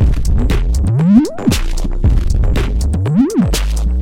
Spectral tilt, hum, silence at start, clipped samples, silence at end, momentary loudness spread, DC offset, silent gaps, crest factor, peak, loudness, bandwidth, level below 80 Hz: -6.5 dB/octave; none; 0 s; under 0.1%; 0 s; 6 LU; under 0.1%; none; 12 dB; 0 dBFS; -15 LUFS; 16 kHz; -14 dBFS